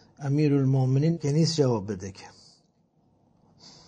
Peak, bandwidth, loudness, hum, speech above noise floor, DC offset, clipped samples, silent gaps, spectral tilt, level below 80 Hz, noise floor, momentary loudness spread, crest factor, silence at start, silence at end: -10 dBFS; 9.4 kHz; -25 LUFS; none; 42 dB; under 0.1%; under 0.1%; none; -7 dB/octave; -66 dBFS; -66 dBFS; 13 LU; 16 dB; 0.2 s; 0.2 s